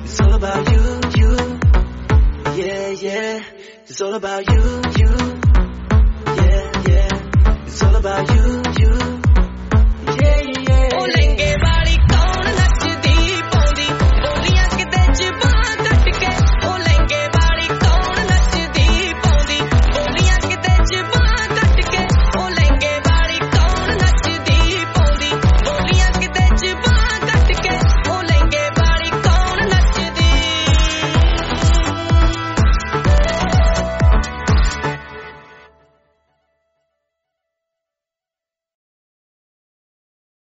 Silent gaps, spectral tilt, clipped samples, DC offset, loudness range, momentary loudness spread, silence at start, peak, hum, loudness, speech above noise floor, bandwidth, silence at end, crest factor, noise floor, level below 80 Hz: none; -4.5 dB/octave; under 0.1%; under 0.1%; 3 LU; 3 LU; 0 s; -2 dBFS; none; -16 LUFS; 73 dB; 8 kHz; 5.1 s; 12 dB; -88 dBFS; -16 dBFS